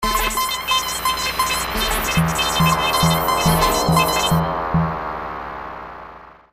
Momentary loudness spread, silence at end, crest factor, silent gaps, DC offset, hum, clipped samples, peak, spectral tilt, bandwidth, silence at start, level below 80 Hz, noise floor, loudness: 14 LU; 0.2 s; 16 dB; none; under 0.1%; none; under 0.1%; -4 dBFS; -3.5 dB/octave; 15.5 kHz; 0 s; -32 dBFS; -40 dBFS; -18 LUFS